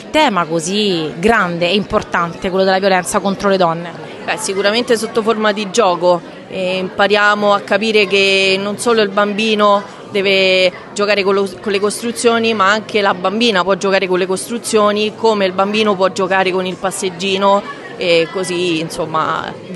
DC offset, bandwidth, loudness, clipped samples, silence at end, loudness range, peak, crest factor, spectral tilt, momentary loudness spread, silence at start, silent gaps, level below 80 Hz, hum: under 0.1%; 12.5 kHz; -14 LUFS; under 0.1%; 0 s; 3 LU; 0 dBFS; 14 dB; -4 dB/octave; 7 LU; 0 s; none; -50 dBFS; none